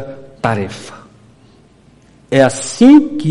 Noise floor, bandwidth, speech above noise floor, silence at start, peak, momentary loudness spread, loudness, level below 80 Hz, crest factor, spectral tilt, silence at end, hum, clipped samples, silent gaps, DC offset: -47 dBFS; 11.5 kHz; 35 dB; 0 s; 0 dBFS; 24 LU; -12 LUFS; -50 dBFS; 14 dB; -5.5 dB/octave; 0 s; none; under 0.1%; none; under 0.1%